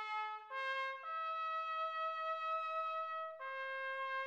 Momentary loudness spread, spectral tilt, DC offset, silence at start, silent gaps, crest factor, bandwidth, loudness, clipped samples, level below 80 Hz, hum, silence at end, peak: 4 LU; 1 dB/octave; under 0.1%; 0 s; none; 12 dB; 8.4 kHz; -41 LUFS; under 0.1%; under -90 dBFS; none; 0 s; -30 dBFS